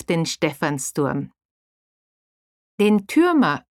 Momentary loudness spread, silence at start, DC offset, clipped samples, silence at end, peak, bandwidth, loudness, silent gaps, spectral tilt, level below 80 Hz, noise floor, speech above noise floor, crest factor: 7 LU; 0.1 s; under 0.1%; under 0.1%; 0.1 s; -6 dBFS; 16 kHz; -20 LUFS; 1.45-2.78 s; -5 dB/octave; -60 dBFS; under -90 dBFS; over 70 dB; 16 dB